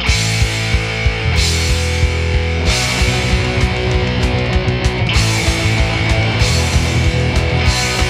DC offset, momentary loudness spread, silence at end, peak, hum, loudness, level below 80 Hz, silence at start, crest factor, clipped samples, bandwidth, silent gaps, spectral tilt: under 0.1%; 2 LU; 0 s; 0 dBFS; none; -15 LUFS; -20 dBFS; 0 s; 14 dB; under 0.1%; 15.5 kHz; none; -4 dB/octave